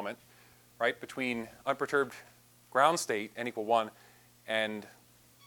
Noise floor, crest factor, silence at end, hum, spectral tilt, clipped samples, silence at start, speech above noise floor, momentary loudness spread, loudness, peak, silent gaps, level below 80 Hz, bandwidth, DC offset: -60 dBFS; 24 dB; 0.55 s; 60 Hz at -60 dBFS; -3 dB/octave; under 0.1%; 0 s; 28 dB; 15 LU; -32 LUFS; -10 dBFS; none; -76 dBFS; 20 kHz; under 0.1%